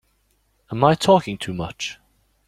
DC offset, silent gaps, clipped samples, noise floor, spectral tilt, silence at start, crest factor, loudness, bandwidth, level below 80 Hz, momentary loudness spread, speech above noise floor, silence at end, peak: under 0.1%; none; under 0.1%; -65 dBFS; -5.5 dB/octave; 0.7 s; 20 dB; -20 LUFS; 14.5 kHz; -52 dBFS; 14 LU; 45 dB; 0.55 s; -2 dBFS